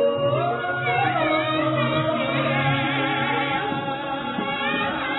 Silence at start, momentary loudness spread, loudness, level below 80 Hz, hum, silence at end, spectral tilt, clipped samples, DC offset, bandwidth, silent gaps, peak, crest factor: 0 s; 5 LU; -23 LUFS; -56 dBFS; none; 0 s; -9 dB/octave; under 0.1%; under 0.1%; 4.1 kHz; none; -8 dBFS; 14 dB